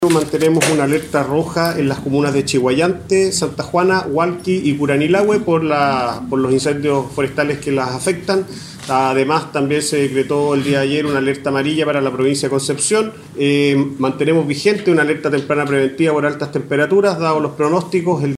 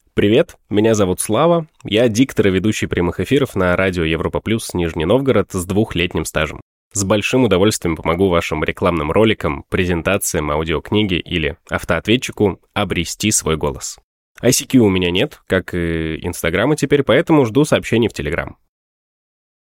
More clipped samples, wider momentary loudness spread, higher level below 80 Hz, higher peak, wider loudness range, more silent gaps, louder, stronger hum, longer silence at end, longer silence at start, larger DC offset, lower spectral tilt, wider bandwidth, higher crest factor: neither; about the same, 5 LU vs 7 LU; second, -50 dBFS vs -38 dBFS; about the same, 0 dBFS vs -2 dBFS; about the same, 2 LU vs 2 LU; second, none vs 6.62-6.91 s, 14.03-14.35 s; about the same, -16 LUFS vs -17 LUFS; neither; second, 0 s vs 1.15 s; second, 0 s vs 0.15 s; neither; about the same, -5 dB/octave vs -5 dB/octave; about the same, 15.5 kHz vs 17 kHz; about the same, 16 dB vs 14 dB